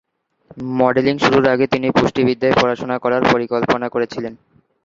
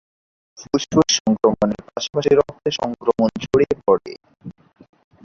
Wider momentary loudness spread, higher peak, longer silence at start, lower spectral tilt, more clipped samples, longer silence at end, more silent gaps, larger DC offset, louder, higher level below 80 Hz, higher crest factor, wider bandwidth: about the same, 10 LU vs 11 LU; about the same, 0 dBFS vs -2 dBFS; about the same, 0.55 s vs 0.6 s; first, -6 dB/octave vs -4.5 dB/octave; neither; second, 0.5 s vs 0.75 s; second, none vs 1.20-1.25 s; neither; first, -16 LUFS vs -19 LUFS; about the same, -50 dBFS vs -50 dBFS; about the same, 18 dB vs 18 dB; about the same, 7.6 kHz vs 7.4 kHz